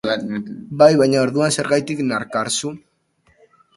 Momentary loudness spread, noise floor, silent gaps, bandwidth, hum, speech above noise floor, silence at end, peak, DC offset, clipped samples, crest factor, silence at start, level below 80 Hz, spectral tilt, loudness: 14 LU; -61 dBFS; none; 11.5 kHz; none; 43 dB; 1 s; 0 dBFS; under 0.1%; under 0.1%; 18 dB; 0.05 s; -60 dBFS; -4.5 dB/octave; -18 LUFS